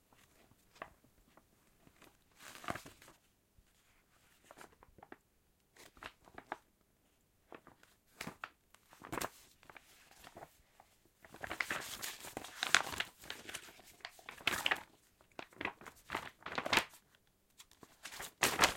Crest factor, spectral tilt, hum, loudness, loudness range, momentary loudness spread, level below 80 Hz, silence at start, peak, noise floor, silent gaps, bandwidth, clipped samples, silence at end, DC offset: 40 dB; -1 dB/octave; none; -40 LUFS; 18 LU; 26 LU; -70 dBFS; 0.75 s; -4 dBFS; -75 dBFS; none; 16.5 kHz; under 0.1%; 0 s; under 0.1%